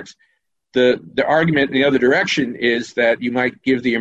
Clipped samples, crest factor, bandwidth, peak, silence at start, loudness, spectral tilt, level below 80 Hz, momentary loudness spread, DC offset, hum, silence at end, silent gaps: under 0.1%; 14 dB; 8.2 kHz; -4 dBFS; 0 s; -17 LUFS; -5.5 dB/octave; -56 dBFS; 4 LU; under 0.1%; none; 0 s; none